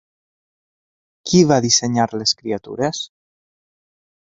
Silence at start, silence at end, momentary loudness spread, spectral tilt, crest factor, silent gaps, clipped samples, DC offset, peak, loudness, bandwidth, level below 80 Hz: 1.25 s; 1.15 s; 15 LU; -4 dB/octave; 20 dB; none; under 0.1%; under 0.1%; 0 dBFS; -17 LUFS; 8 kHz; -54 dBFS